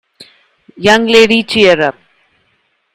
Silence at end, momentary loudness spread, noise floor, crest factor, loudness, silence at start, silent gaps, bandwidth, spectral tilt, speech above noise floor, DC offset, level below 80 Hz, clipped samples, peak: 1.05 s; 7 LU; -60 dBFS; 12 dB; -9 LUFS; 0.8 s; none; 15 kHz; -4 dB/octave; 51 dB; under 0.1%; -48 dBFS; 0.5%; 0 dBFS